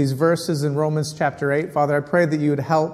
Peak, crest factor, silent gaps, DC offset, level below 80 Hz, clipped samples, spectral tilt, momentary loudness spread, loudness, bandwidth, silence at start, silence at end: -4 dBFS; 16 dB; none; under 0.1%; -60 dBFS; under 0.1%; -6.5 dB/octave; 4 LU; -21 LUFS; 15 kHz; 0 s; 0 s